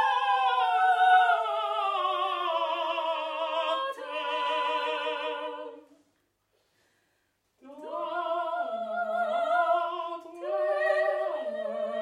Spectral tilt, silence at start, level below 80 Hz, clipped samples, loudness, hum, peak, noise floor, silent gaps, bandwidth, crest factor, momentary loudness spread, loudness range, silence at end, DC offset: -2 dB/octave; 0 s; -88 dBFS; under 0.1%; -28 LUFS; none; -10 dBFS; -74 dBFS; none; 11.5 kHz; 18 dB; 10 LU; 11 LU; 0 s; under 0.1%